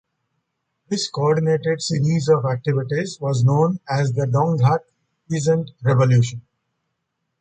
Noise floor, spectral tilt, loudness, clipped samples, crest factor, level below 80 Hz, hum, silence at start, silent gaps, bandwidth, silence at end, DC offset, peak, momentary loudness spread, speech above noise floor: -76 dBFS; -6.5 dB/octave; -20 LUFS; under 0.1%; 16 dB; -56 dBFS; none; 0.9 s; none; 9 kHz; 1 s; under 0.1%; -4 dBFS; 8 LU; 57 dB